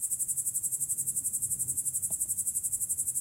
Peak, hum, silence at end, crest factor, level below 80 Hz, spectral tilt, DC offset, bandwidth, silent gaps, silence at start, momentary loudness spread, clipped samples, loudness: -14 dBFS; none; 0 s; 18 dB; -64 dBFS; -1.5 dB/octave; under 0.1%; 16 kHz; none; 0 s; 1 LU; under 0.1%; -29 LUFS